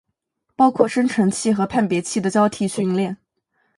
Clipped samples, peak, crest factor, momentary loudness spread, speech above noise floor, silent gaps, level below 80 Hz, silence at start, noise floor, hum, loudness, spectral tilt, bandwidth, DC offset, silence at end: under 0.1%; 0 dBFS; 20 dB; 6 LU; 55 dB; none; -58 dBFS; 0.6 s; -74 dBFS; none; -19 LUFS; -5.5 dB/octave; 11.5 kHz; under 0.1%; 0.6 s